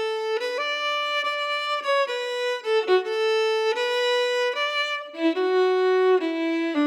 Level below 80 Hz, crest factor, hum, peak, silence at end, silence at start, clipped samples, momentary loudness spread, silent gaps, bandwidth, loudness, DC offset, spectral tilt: under -90 dBFS; 14 dB; none; -10 dBFS; 0 s; 0 s; under 0.1%; 5 LU; none; 12.5 kHz; -23 LUFS; under 0.1%; -0.5 dB/octave